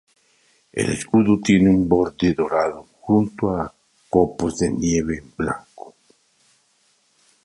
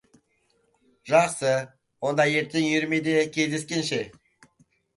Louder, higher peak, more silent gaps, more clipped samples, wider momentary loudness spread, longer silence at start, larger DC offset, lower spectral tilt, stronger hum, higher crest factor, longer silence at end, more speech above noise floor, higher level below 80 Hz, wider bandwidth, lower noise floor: first, -20 LUFS vs -24 LUFS; first, -2 dBFS vs -6 dBFS; neither; neither; first, 12 LU vs 9 LU; second, 0.75 s vs 1.05 s; neither; first, -6 dB/octave vs -4.5 dB/octave; neither; about the same, 18 dB vs 20 dB; first, 1.55 s vs 0.85 s; about the same, 44 dB vs 45 dB; first, -44 dBFS vs -68 dBFS; about the same, 11.5 kHz vs 11.5 kHz; second, -63 dBFS vs -69 dBFS